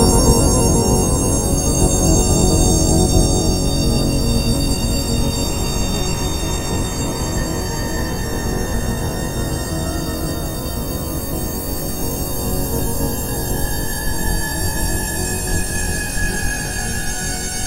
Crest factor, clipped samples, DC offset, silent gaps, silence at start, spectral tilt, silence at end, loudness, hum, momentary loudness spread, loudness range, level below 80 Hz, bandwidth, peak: 18 dB; under 0.1%; under 0.1%; none; 0 s; -4 dB/octave; 0 s; -19 LUFS; none; 8 LU; 7 LU; -22 dBFS; 16 kHz; 0 dBFS